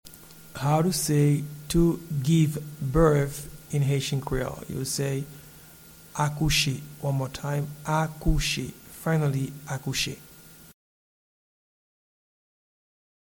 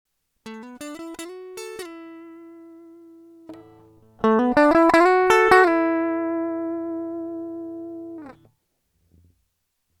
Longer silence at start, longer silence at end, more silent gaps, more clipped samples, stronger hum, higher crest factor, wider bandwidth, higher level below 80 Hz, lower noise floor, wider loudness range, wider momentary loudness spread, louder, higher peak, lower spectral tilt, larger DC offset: second, 0.05 s vs 0.45 s; first, 2.65 s vs 1.7 s; neither; neither; neither; about the same, 20 dB vs 22 dB; first, 19 kHz vs 14 kHz; first, -40 dBFS vs -56 dBFS; second, -50 dBFS vs -74 dBFS; second, 7 LU vs 20 LU; second, 12 LU vs 24 LU; second, -26 LUFS vs -19 LUFS; second, -8 dBFS vs 0 dBFS; about the same, -5 dB/octave vs -4.5 dB/octave; neither